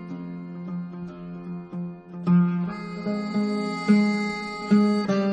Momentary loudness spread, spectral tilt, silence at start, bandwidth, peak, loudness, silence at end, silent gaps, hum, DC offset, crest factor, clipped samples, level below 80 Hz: 16 LU; -7.5 dB/octave; 0 s; 9.4 kHz; -8 dBFS; -25 LUFS; 0 s; none; none; under 0.1%; 18 dB; under 0.1%; -62 dBFS